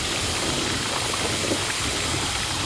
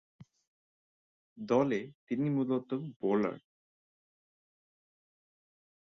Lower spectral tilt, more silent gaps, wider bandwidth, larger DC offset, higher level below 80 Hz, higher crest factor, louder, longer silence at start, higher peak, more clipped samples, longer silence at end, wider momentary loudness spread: second, -2 dB/octave vs -8 dB/octave; second, none vs 0.47-1.36 s, 1.95-2.07 s, 2.96-3.00 s; first, 11 kHz vs 6.6 kHz; neither; first, -40 dBFS vs -76 dBFS; second, 14 dB vs 20 dB; first, -23 LUFS vs -33 LUFS; second, 0 s vs 0.2 s; first, -10 dBFS vs -16 dBFS; neither; second, 0 s vs 2.55 s; second, 1 LU vs 10 LU